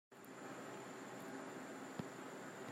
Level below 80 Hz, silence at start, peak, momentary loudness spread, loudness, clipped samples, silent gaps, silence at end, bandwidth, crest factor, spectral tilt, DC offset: -88 dBFS; 0.1 s; -32 dBFS; 3 LU; -51 LUFS; under 0.1%; none; 0 s; 16 kHz; 20 dB; -4.5 dB/octave; under 0.1%